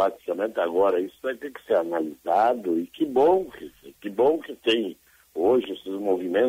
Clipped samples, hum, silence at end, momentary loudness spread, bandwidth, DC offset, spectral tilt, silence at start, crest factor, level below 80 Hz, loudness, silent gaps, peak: under 0.1%; none; 0 s; 13 LU; 16 kHz; under 0.1%; -5.5 dB/octave; 0 s; 14 dB; -66 dBFS; -24 LUFS; none; -10 dBFS